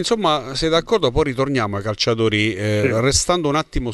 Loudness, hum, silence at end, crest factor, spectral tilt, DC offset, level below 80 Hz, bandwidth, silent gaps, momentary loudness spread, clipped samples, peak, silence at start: -18 LUFS; none; 0 s; 16 dB; -4 dB/octave; under 0.1%; -34 dBFS; 12 kHz; none; 4 LU; under 0.1%; -4 dBFS; 0 s